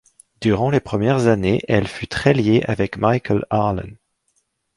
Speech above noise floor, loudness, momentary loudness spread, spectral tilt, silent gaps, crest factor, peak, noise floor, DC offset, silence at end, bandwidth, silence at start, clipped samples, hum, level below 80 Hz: 50 dB; -19 LUFS; 7 LU; -7 dB/octave; none; 18 dB; 0 dBFS; -68 dBFS; under 0.1%; 0.85 s; 11.5 kHz; 0.4 s; under 0.1%; none; -42 dBFS